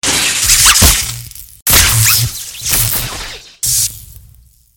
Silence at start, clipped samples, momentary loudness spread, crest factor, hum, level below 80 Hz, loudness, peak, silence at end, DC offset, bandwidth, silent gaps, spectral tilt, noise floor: 0.05 s; 0.4%; 16 LU; 14 dB; none; -26 dBFS; -9 LUFS; 0 dBFS; 0.65 s; under 0.1%; over 20 kHz; 1.62-1.66 s; -1 dB/octave; -44 dBFS